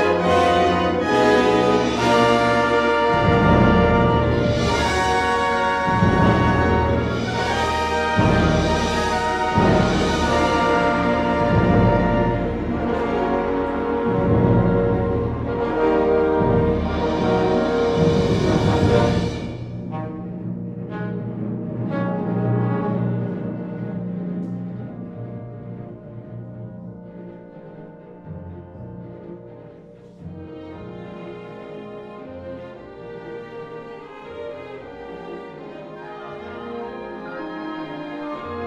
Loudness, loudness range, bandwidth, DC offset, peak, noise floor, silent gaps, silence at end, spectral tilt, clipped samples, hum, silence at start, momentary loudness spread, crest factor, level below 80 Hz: -19 LUFS; 20 LU; 12 kHz; under 0.1%; -2 dBFS; -43 dBFS; none; 0 s; -6.5 dB/octave; under 0.1%; none; 0 s; 20 LU; 18 dB; -36 dBFS